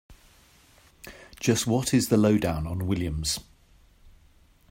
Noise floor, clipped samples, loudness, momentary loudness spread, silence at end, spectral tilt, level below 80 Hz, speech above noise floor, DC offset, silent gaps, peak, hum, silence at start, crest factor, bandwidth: -58 dBFS; under 0.1%; -25 LUFS; 24 LU; 0.6 s; -5 dB/octave; -46 dBFS; 34 dB; under 0.1%; none; -8 dBFS; none; 0.1 s; 20 dB; 16 kHz